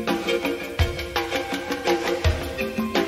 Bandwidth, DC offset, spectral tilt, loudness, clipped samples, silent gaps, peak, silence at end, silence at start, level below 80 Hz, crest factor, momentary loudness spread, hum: 16 kHz; under 0.1%; -5 dB/octave; -25 LUFS; under 0.1%; none; -8 dBFS; 0 s; 0 s; -34 dBFS; 16 dB; 4 LU; none